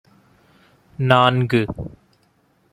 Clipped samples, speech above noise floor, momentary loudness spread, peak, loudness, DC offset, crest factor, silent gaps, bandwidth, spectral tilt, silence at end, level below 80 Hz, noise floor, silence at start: under 0.1%; 43 dB; 18 LU; -2 dBFS; -18 LUFS; under 0.1%; 20 dB; none; 11.5 kHz; -7 dB/octave; 0.85 s; -50 dBFS; -61 dBFS; 1 s